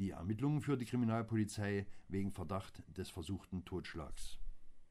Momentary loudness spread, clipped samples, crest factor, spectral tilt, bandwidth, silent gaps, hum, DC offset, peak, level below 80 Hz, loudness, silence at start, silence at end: 14 LU; under 0.1%; 16 dB; -6.5 dB/octave; 15 kHz; none; none; under 0.1%; -26 dBFS; -56 dBFS; -41 LUFS; 0 s; 0 s